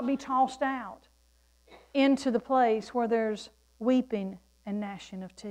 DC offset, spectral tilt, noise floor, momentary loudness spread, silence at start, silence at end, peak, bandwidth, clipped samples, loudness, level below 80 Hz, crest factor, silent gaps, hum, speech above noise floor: under 0.1%; -5.5 dB/octave; -65 dBFS; 16 LU; 0 s; 0 s; -14 dBFS; 10.5 kHz; under 0.1%; -29 LUFS; -66 dBFS; 16 dB; none; none; 36 dB